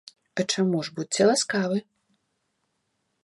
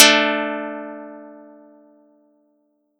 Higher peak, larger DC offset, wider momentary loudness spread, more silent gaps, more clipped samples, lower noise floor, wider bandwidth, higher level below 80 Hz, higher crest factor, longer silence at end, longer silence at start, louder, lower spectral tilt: second, -8 dBFS vs 0 dBFS; neither; second, 9 LU vs 26 LU; neither; neither; first, -76 dBFS vs -66 dBFS; second, 11.5 kHz vs 18.5 kHz; about the same, -74 dBFS vs -78 dBFS; about the same, 20 dB vs 22 dB; second, 1.4 s vs 1.65 s; first, 0.35 s vs 0 s; second, -25 LUFS vs -18 LUFS; first, -4 dB/octave vs -0.5 dB/octave